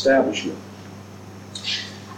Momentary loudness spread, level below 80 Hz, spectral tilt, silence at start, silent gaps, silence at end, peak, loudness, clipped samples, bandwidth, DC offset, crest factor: 21 LU; -66 dBFS; -4 dB/octave; 0 s; none; 0 s; -6 dBFS; -24 LUFS; under 0.1%; 15.5 kHz; under 0.1%; 18 dB